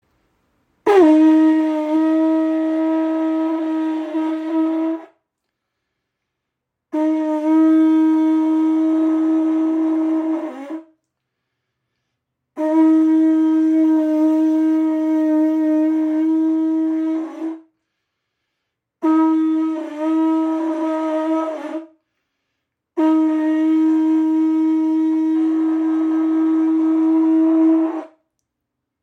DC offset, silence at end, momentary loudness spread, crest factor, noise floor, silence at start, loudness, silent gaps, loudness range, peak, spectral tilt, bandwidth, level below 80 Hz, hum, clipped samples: under 0.1%; 0.95 s; 9 LU; 14 dB; -80 dBFS; 0.85 s; -17 LUFS; none; 6 LU; -4 dBFS; -5.5 dB/octave; 4.2 kHz; -74 dBFS; none; under 0.1%